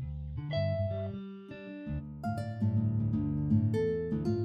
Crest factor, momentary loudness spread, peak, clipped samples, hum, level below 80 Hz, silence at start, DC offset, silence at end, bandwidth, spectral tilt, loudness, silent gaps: 16 dB; 14 LU; -16 dBFS; under 0.1%; none; -48 dBFS; 0 s; under 0.1%; 0 s; 6 kHz; -9.5 dB/octave; -33 LUFS; none